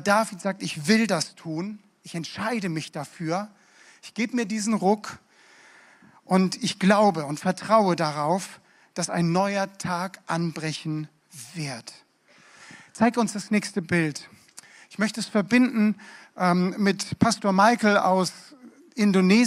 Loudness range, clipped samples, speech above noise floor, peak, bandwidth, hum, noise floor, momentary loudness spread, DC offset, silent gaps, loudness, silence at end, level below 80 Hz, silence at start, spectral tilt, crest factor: 7 LU; under 0.1%; 33 dB; -4 dBFS; 14 kHz; none; -57 dBFS; 18 LU; under 0.1%; none; -24 LUFS; 0 s; -68 dBFS; 0 s; -5 dB/octave; 20 dB